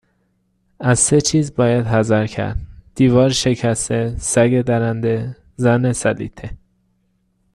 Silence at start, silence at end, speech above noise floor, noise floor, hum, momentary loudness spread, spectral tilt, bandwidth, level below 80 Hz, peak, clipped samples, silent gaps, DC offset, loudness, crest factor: 0.8 s; 1 s; 48 dB; -64 dBFS; none; 13 LU; -5 dB/octave; 12.5 kHz; -38 dBFS; 0 dBFS; under 0.1%; none; under 0.1%; -17 LUFS; 18 dB